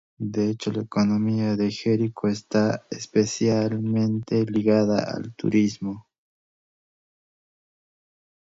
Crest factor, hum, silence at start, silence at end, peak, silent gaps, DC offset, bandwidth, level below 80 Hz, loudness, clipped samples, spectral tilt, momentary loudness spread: 18 dB; none; 0.2 s; 2.55 s; -8 dBFS; none; under 0.1%; 7.8 kHz; -60 dBFS; -24 LUFS; under 0.1%; -6.5 dB/octave; 8 LU